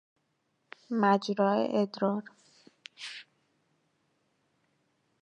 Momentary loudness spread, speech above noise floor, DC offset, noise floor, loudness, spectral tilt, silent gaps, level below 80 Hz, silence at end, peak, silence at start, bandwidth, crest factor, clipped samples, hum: 16 LU; 48 dB; under 0.1%; -77 dBFS; -29 LUFS; -6.5 dB/octave; none; -86 dBFS; 2 s; -12 dBFS; 0.9 s; 9.8 kHz; 22 dB; under 0.1%; none